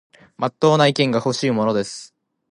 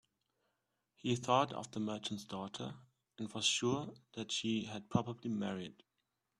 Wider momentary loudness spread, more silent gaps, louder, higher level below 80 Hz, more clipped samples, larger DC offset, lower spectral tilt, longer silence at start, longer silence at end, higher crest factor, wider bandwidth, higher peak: second, 12 LU vs 15 LU; neither; first, -19 LUFS vs -38 LUFS; first, -64 dBFS vs -74 dBFS; neither; neither; first, -5.5 dB/octave vs -4 dB/octave; second, 0.4 s vs 1.05 s; second, 0.45 s vs 0.7 s; second, 18 dB vs 24 dB; second, 11 kHz vs 12.5 kHz; first, -2 dBFS vs -16 dBFS